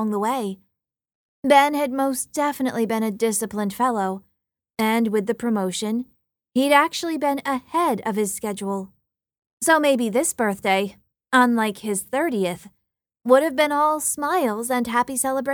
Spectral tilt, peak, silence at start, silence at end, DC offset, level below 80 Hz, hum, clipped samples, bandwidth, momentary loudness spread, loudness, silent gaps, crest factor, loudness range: -3.5 dB/octave; -4 dBFS; 0 s; 0 s; under 0.1%; -64 dBFS; none; under 0.1%; 19.5 kHz; 11 LU; -22 LUFS; 1.15-1.43 s, 9.38-9.42 s, 9.53-9.57 s; 18 dB; 3 LU